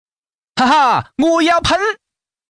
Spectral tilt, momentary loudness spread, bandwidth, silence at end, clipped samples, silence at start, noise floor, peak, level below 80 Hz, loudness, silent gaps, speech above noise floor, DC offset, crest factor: -4 dB/octave; 10 LU; 10.5 kHz; 0.55 s; under 0.1%; 0.55 s; under -90 dBFS; -4 dBFS; -42 dBFS; -14 LUFS; none; over 77 dB; under 0.1%; 12 dB